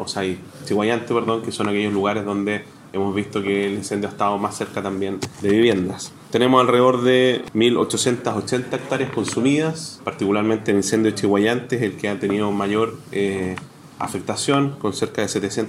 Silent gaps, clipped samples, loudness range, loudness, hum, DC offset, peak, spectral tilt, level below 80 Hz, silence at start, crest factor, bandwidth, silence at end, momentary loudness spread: none; under 0.1%; 5 LU; -21 LUFS; none; under 0.1%; 0 dBFS; -5 dB/octave; -60 dBFS; 0 s; 20 dB; 15.5 kHz; 0 s; 10 LU